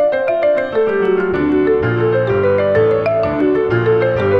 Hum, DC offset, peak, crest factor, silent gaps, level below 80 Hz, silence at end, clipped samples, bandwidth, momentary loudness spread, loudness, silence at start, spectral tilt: none; under 0.1%; -4 dBFS; 10 dB; none; -42 dBFS; 0 s; under 0.1%; 5.8 kHz; 2 LU; -15 LUFS; 0 s; -9 dB/octave